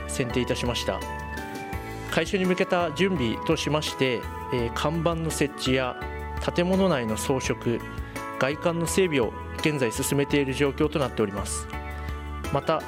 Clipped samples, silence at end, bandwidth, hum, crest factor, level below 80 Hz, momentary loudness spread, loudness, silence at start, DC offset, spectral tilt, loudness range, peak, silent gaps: under 0.1%; 0 s; 16.5 kHz; none; 20 dB; -42 dBFS; 11 LU; -26 LUFS; 0 s; under 0.1%; -5 dB/octave; 1 LU; -6 dBFS; none